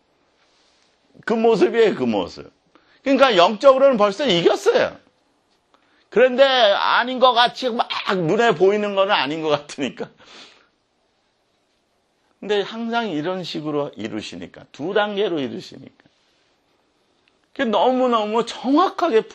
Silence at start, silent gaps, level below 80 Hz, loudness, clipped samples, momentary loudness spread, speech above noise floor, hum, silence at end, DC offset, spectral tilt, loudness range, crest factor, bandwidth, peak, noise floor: 1.25 s; none; -66 dBFS; -18 LUFS; under 0.1%; 16 LU; 48 dB; none; 0.05 s; under 0.1%; -4.5 dB/octave; 11 LU; 20 dB; 9.8 kHz; 0 dBFS; -66 dBFS